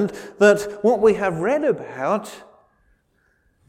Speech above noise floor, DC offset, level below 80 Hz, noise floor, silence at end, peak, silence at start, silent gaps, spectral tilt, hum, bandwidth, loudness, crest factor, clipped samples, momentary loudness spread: 45 dB; under 0.1%; -56 dBFS; -65 dBFS; 1.3 s; -4 dBFS; 0 s; none; -5.5 dB/octave; none; 14.5 kHz; -20 LUFS; 18 dB; under 0.1%; 9 LU